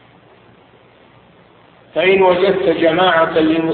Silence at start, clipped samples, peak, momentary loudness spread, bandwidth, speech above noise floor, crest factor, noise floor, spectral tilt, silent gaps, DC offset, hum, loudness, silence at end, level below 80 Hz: 1.95 s; under 0.1%; -2 dBFS; 4 LU; 4.5 kHz; 34 dB; 14 dB; -47 dBFS; -9 dB/octave; none; under 0.1%; none; -13 LUFS; 0 s; -52 dBFS